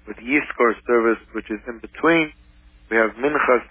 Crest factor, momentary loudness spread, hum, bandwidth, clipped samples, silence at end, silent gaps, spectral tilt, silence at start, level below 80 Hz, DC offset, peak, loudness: 16 dB; 12 LU; none; 3.7 kHz; under 0.1%; 0.05 s; none; -8.5 dB/octave; 0.05 s; -50 dBFS; under 0.1%; -4 dBFS; -20 LUFS